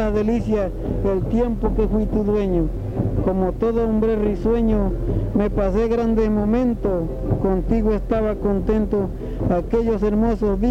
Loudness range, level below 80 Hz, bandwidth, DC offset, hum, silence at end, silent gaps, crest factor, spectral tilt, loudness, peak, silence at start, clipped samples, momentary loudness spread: 1 LU; -26 dBFS; 7 kHz; under 0.1%; none; 0 s; none; 12 dB; -9.5 dB/octave; -21 LUFS; -6 dBFS; 0 s; under 0.1%; 4 LU